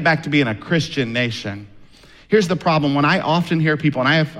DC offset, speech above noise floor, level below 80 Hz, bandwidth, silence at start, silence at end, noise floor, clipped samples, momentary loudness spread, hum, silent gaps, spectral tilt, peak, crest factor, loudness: under 0.1%; 27 dB; -52 dBFS; 12 kHz; 0 s; 0 s; -45 dBFS; under 0.1%; 6 LU; none; none; -6 dB/octave; -4 dBFS; 16 dB; -18 LUFS